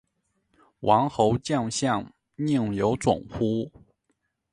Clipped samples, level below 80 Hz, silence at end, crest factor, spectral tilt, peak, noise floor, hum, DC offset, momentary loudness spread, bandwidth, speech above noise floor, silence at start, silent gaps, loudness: under 0.1%; -54 dBFS; 0.85 s; 22 dB; -6 dB/octave; -6 dBFS; -75 dBFS; none; under 0.1%; 9 LU; 11.5 kHz; 51 dB; 0.8 s; none; -25 LUFS